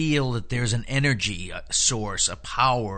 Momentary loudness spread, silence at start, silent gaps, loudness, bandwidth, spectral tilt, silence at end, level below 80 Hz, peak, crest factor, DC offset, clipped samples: 5 LU; 0 s; none; -24 LUFS; 9.2 kHz; -3.5 dB/octave; 0 s; -40 dBFS; -6 dBFS; 18 dB; under 0.1%; under 0.1%